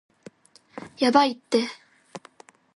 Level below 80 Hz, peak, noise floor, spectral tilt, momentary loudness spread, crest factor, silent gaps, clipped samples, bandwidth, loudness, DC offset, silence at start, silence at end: -72 dBFS; -4 dBFS; -54 dBFS; -4 dB/octave; 25 LU; 24 dB; none; under 0.1%; 11.5 kHz; -23 LUFS; under 0.1%; 0.75 s; 0.55 s